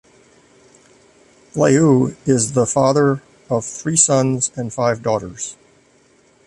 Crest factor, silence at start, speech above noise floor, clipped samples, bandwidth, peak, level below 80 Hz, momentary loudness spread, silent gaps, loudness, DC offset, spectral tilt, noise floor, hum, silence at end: 18 dB; 1.55 s; 38 dB; under 0.1%; 11.5 kHz; -2 dBFS; -54 dBFS; 13 LU; none; -17 LUFS; under 0.1%; -5 dB/octave; -54 dBFS; none; 0.95 s